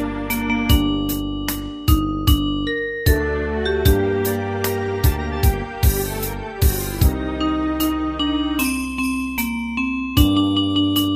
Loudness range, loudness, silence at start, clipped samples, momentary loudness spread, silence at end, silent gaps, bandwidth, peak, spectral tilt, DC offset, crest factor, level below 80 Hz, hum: 1 LU; -20 LUFS; 0 s; under 0.1%; 6 LU; 0 s; none; 15.5 kHz; -2 dBFS; -5.5 dB/octave; under 0.1%; 18 dB; -24 dBFS; none